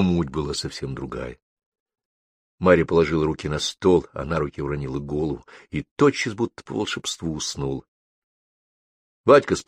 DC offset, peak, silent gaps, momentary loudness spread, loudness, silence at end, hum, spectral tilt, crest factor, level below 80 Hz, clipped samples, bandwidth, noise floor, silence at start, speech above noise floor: under 0.1%; -2 dBFS; 1.42-1.57 s, 1.66-1.72 s, 1.80-1.86 s, 2.05-2.58 s, 5.91-5.96 s, 7.88-9.24 s; 14 LU; -23 LUFS; 0.05 s; none; -5.5 dB/octave; 22 dB; -44 dBFS; under 0.1%; 14.5 kHz; under -90 dBFS; 0 s; over 68 dB